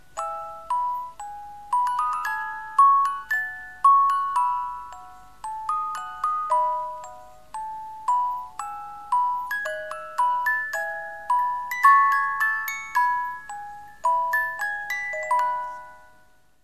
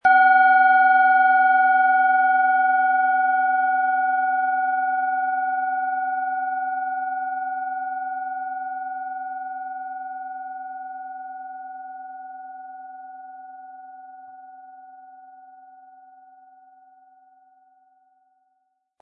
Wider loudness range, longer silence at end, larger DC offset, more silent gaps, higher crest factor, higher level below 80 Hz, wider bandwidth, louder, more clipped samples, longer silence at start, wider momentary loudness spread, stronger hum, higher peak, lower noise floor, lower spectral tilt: second, 6 LU vs 23 LU; second, 0.65 s vs 4 s; first, 0.4% vs under 0.1%; neither; about the same, 20 dB vs 16 dB; first, -62 dBFS vs -80 dBFS; first, 14 kHz vs 4.4 kHz; second, -24 LUFS vs -20 LUFS; neither; about the same, 0.15 s vs 0.05 s; second, 19 LU vs 24 LU; neither; about the same, -6 dBFS vs -6 dBFS; second, -60 dBFS vs -72 dBFS; second, -0.5 dB/octave vs -4 dB/octave